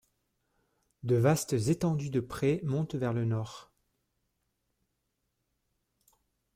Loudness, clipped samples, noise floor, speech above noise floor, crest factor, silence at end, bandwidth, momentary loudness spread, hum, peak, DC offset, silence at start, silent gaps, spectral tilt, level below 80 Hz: -30 LUFS; under 0.1%; -81 dBFS; 52 dB; 20 dB; 2.95 s; 16 kHz; 11 LU; none; -14 dBFS; under 0.1%; 1.05 s; none; -6.5 dB/octave; -62 dBFS